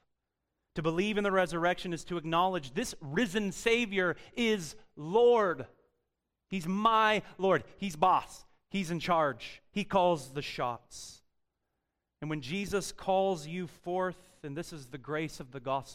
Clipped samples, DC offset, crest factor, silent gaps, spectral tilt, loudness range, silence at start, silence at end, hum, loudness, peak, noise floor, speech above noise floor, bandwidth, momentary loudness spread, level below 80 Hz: under 0.1%; under 0.1%; 20 dB; none; -5 dB/octave; 6 LU; 0.75 s; 0 s; none; -31 LUFS; -12 dBFS; -85 dBFS; 54 dB; 16 kHz; 16 LU; -58 dBFS